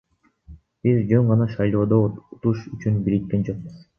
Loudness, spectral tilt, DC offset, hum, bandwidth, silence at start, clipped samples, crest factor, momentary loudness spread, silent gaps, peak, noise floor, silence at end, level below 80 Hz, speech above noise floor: -22 LUFS; -10.5 dB/octave; under 0.1%; none; 6.4 kHz; 0.5 s; under 0.1%; 18 dB; 8 LU; none; -4 dBFS; -48 dBFS; 0.2 s; -48 dBFS; 27 dB